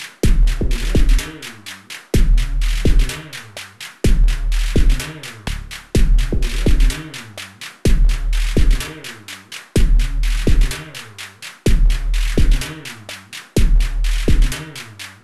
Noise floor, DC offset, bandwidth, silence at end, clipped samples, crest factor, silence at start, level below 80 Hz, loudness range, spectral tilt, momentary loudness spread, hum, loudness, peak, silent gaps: -35 dBFS; under 0.1%; 13 kHz; 0.15 s; under 0.1%; 14 dB; 0 s; -16 dBFS; 2 LU; -5 dB/octave; 14 LU; none; -20 LUFS; -2 dBFS; none